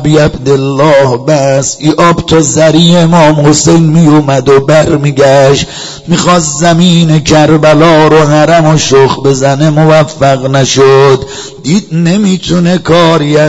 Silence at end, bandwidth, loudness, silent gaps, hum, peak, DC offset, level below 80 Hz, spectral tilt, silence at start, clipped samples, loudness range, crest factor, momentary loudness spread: 0 s; 11 kHz; -6 LUFS; none; none; 0 dBFS; under 0.1%; -32 dBFS; -5.5 dB/octave; 0 s; 5%; 2 LU; 6 dB; 5 LU